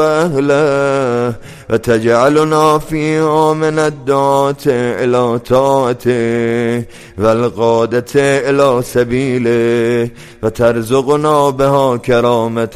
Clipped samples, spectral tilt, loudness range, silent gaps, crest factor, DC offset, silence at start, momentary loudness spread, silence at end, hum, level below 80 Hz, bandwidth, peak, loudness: under 0.1%; -6 dB/octave; 1 LU; none; 12 dB; under 0.1%; 0 s; 5 LU; 0 s; none; -42 dBFS; 15 kHz; 0 dBFS; -13 LUFS